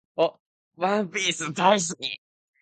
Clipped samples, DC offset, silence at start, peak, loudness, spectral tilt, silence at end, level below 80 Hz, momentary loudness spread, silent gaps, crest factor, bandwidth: under 0.1%; under 0.1%; 0.15 s; -4 dBFS; -25 LUFS; -3 dB/octave; 0.45 s; -74 dBFS; 11 LU; 0.40-0.71 s; 22 dB; 9.4 kHz